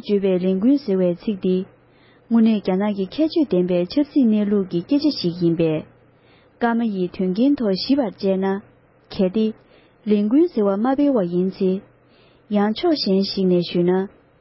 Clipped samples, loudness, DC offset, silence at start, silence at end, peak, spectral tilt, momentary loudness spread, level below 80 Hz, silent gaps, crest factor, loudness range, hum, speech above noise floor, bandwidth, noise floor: under 0.1%; -20 LUFS; under 0.1%; 0.05 s; 0.35 s; -6 dBFS; -11 dB/octave; 6 LU; -58 dBFS; none; 14 dB; 2 LU; none; 34 dB; 5.8 kHz; -53 dBFS